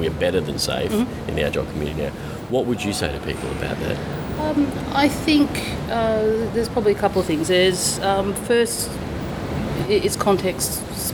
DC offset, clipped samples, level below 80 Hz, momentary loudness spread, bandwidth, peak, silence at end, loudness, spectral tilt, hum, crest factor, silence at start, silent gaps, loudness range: under 0.1%; under 0.1%; -38 dBFS; 8 LU; over 20 kHz; -4 dBFS; 0 s; -21 LUFS; -4.5 dB/octave; none; 18 dB; 0 s; none; 5 LU